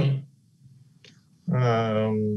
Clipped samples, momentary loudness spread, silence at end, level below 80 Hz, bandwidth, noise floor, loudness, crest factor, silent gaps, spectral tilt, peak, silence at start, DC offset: under 0.1%; 9 LU; 0 s; -72 dBFS; 6.4 kHz; -55 dBFS; -25 LUFS; 14 dB; none; -8.5 dB/octave; -12 dBFS; 0 s; under 0.1%